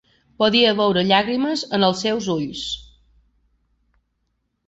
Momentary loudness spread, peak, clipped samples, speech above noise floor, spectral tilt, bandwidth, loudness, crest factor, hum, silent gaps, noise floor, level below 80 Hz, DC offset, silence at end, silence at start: 11 LU; -2 dBFS; under 0.1%; 53 dB; -4.5 dB/octave; 8.2 kHz; -19 LUFS; 20 dB; none; none; -72 dBFS; -54 dBFS; under 0.1%; 1.85 s; 0.4 s